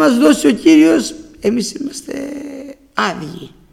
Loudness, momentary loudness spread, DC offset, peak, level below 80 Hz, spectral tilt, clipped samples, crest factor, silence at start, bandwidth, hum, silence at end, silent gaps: -14 LUFS; 20 LU; under 0.1%; 0 dBFS; -50 dBFS; -4.5 dB/octave; under 0.1%; 14 dB; 0 s; 14.5 kHz; none; 0.25 s; none